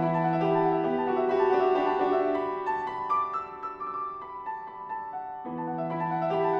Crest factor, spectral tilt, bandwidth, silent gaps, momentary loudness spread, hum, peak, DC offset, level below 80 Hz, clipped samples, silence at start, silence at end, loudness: 14 dB; -8.5 dB/octave; 6.2 kHz; none; 13 LU; none; -14 dBFS; under 0.1%; -66 dBFS; under 0.1%; 0 s; 0 s; -28 LUFS